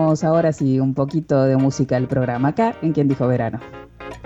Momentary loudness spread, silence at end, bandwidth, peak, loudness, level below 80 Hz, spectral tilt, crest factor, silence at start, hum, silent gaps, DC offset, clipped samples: 11 LU; 0 s; 8 kHz; -6 dBFS; -19 LUFS; -50 dBFS; -8 dB/octave; 12 dB; 0 s; none; none; under 0.1%; under 0.1%